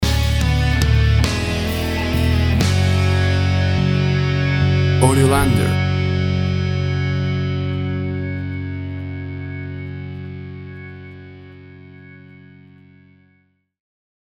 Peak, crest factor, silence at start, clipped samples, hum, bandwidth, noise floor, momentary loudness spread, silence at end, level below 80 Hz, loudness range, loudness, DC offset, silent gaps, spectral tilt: 0 dBFS; 18 dB; 0 s; under 0.1%; none; over 20 kHz; -61 dBFS; 16 LU; 2.05 s; -28 dBFS; 17 LU; -18 LUFS; under 0.1%; none; -6 dB/octave